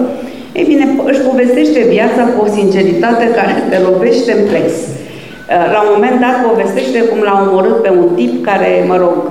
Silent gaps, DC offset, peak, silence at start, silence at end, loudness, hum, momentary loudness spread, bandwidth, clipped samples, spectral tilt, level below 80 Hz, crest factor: none; 0.7%; 0 dBFS; 0 s; 0 s; -10 LUFS; none; 6 LU; 13.5 kHz; under 0.1%; -6 dB/octave; -52 dBFS; 10 dB